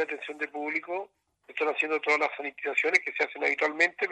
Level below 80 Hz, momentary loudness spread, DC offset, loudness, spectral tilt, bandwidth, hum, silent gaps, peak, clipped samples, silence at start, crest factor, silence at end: -84 dBFS; 11 LU; under 0.1%; -28 LUFS; -2 dB/octave; 9.4 kHz; none; none; -8 dBFS; under 0.1%; 0 s; 22 dB; 0 s